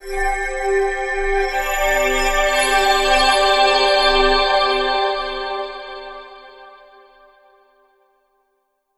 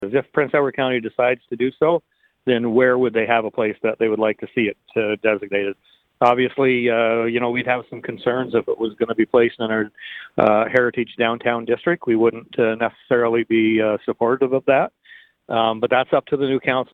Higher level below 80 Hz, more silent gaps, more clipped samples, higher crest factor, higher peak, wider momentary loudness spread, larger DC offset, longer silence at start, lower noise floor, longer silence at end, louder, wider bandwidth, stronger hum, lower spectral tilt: first, -32 dBFS vs -60 dBFS; neither; neither; about the same, 18 dB vs 18 dB; about the same, -2 dBFS vs 0 dBFS; first, 13 LU vs 7 LU; neither; about the same, 0 s vs 0 s; first, -69 dBFS vs -49 dBFS; first, 2.2 s vs 0.1 s; first, -16 LUFS vs -20 LUFS; first, 13.5 kHz vs 4.8 kHz; neither; second, -1.5 dB/octave vs -8 dB/octave